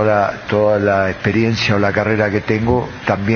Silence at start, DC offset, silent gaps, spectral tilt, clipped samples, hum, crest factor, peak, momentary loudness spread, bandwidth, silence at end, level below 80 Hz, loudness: 0 s; under 0.1%; none; -5 dB/octave; under 0.1%; none; 16 dB; 0 dBFS; 4 LU; 6.8 kHz; 0 s; -42 dBFS; -16 LUFS